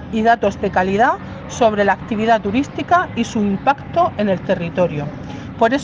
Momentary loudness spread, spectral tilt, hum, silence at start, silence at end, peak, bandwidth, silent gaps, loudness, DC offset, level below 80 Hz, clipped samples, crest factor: 8 LU; -6 dB/octave; none; 0 s; 0 s; -2 dBFS; 9.4 kHz; none; -17 LUFS; under 0.1%; -44 dBFS; under 0.1%; 16 dB